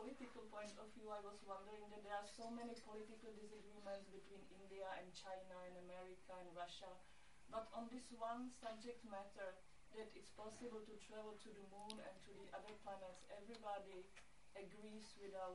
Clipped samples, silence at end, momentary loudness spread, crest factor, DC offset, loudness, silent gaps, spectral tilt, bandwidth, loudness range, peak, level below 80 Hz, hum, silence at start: under 0.1%; 0 s; 9 LU; 22 dB; under 0.1%; -56 LUFS; none; -4 dB/octave; 11.5 kHz; 3 LU; -34 dBFS; -76 dBFS; none; 0 s